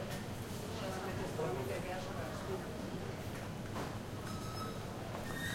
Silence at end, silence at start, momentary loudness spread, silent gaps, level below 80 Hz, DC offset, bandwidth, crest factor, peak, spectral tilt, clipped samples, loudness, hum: 0 s; 0 s; 4 LU; none; -56 dBFS; under 0.1%; 16.5 kHz; 16 dB; -26 dBFS; -5 dB/octave; under 0.1%; -42 LUFS; none